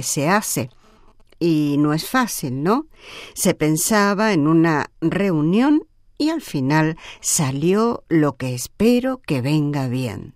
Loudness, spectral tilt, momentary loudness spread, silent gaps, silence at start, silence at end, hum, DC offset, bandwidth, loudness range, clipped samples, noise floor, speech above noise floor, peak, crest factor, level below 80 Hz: -19 LUFS; -5 dB/octave; 8 LU; none; 0 s; 0.05 s; none; under 0.1%; 16 kHz; 3 LU; under 0.1%; -49 dBFS; 30 dB; -4 dBFS; 16 dB; -50 dBFS